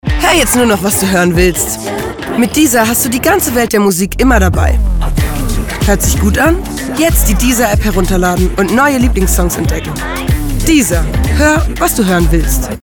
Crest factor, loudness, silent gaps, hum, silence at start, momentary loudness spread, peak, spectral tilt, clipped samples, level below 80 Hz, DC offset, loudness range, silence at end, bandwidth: 10 dB; -11 LUFS; none; none; 0.05 s; 6 LU; 0 dBFS; -4.5 dB/octave; under 0.1%; -16 dBFS; under 0.1%; 1 LU; 0.05 s; 19.5 kHz